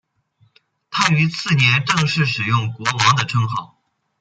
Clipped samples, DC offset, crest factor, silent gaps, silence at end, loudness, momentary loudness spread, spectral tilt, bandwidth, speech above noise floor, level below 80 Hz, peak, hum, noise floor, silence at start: under 0.1%; under 0.1%; 20 dB; none; 0.55 s; -17 LUFS; 8 LU; -4 dB/octave; 9.2 kHz; 42 dB; -56 dBFS; 0 dBFS; none; -60 dBFS; 0.9 s